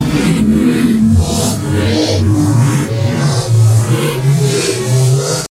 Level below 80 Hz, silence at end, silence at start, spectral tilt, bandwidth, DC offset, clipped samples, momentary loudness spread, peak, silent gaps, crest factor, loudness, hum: -32 dBFS; 0.05 s; 0 s; -6 dB/octave; 16 kHz; under 0.1%; under 0.1%; 4 LU; 0 dBFS; none; 10 dB; -12 LUFS; none